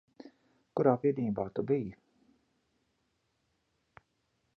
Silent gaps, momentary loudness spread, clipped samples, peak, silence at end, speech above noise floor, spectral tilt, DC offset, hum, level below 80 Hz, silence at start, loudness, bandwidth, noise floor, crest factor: none; 10 LU; under 0.1%; -12 dBFS; 2.65 s; 48 dB; -10.5 dB/octave; under 0.1%; none; -70 dBFS; 0.25 s; -32 LUFS; 5.8 kHz; -78 dBFS; 24 dB